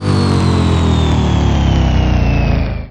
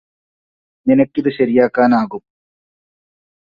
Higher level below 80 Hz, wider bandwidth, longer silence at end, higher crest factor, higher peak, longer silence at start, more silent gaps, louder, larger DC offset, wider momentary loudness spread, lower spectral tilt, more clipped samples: first, -18 dBFS vs -58 dBFS; first, 10 kHz vs 5.2 kHz; second, 0 s vs 1.25 s; second, 10 dB vs 18 dB; about the same, -2 dBFS vs 0 dBFS; second, 0 s vs 0.85 s; neither; about the same, -13 LUFS vs -15 LUFS; first, 1% vs under 0.1%; second, 2 LU vs 11 LU; second, -7 dB/octave vs -9 dB/octave; neither